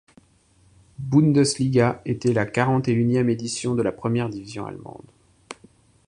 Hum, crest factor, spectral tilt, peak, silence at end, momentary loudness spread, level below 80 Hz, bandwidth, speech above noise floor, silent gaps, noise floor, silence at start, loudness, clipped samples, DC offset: none; 20 dB; -6 dB/octave; -4 dBFS; 0.55 s; 22 LU; -56 dBFS; 11 kHz; 37 dB; none; -59 dBFS; 1 s; -22 LUFS; under 0.1%; under 0.1%